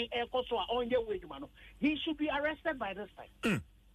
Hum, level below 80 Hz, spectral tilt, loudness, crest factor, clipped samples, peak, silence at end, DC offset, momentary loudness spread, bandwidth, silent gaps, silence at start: none; -58 dBFS; -5.5 dB/octave; -35 LUFS; 16 dB; under 0.1%; -20 dBFS; 0.3 s; under 0.1%; 13 LU; 13 kHz; none; 0 s